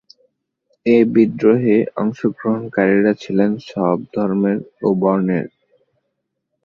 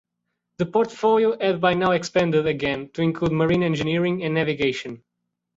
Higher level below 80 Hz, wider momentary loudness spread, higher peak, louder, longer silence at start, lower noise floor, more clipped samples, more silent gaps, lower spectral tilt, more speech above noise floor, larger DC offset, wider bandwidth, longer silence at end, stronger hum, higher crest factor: second, -60 dBFS vs -54 dBFS; about the same, 7 LU vs 6 LU; first, -2 dBFS vs -8 dBFS; first, -17 LUFS vs -22 LUFS; first, 0.85 s vs 0.6 s; second, -74 dBFS vs -79 dBFS; neither; neither; first, -9 dB/octave vs -6.5 dB/octave; about the same, 58 dB vs 58 dB; neither; second, 6.8 kHz vs 7.8 kHz; first, 1.2 s vs 0.6 s; neither; about the same, 16 dB vs 16 dB